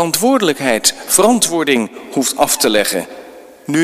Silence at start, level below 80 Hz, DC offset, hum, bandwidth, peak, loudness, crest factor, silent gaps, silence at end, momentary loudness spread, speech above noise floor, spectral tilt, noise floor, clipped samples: 0 s; -52 dBFS; under 0.1%; none; 16 kHz; 0 dBFS; -14 LUFS; 14 dB; none; 0 s; 9 LU; 22 dB; -2.5 dB/octave; -37 dBFS; under 0.1%